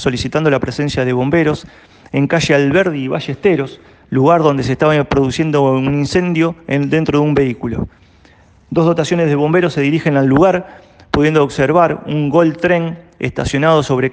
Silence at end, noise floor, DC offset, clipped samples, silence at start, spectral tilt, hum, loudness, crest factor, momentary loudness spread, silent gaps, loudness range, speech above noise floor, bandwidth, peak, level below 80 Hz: 0 s; -47 dBFS; under 0.1%; under 0.1%; 0 s; -6.5 dB/octave; none; -14 LUFS; 14 dB; 8 LU; none; 2 LU; 33 dB; 9.4 kHz; 0 dBFS; -40 dBFS